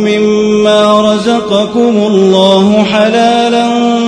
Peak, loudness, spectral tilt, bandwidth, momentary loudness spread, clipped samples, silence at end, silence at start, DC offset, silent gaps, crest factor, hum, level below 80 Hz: 0 dBFS; -8 LUFS; -5.5 dB/octave; 10.5 kHz; 4 LU; 0.9%; 0 s; 0 s; under 0.1%; none; 8 dB; none; -46 dBFS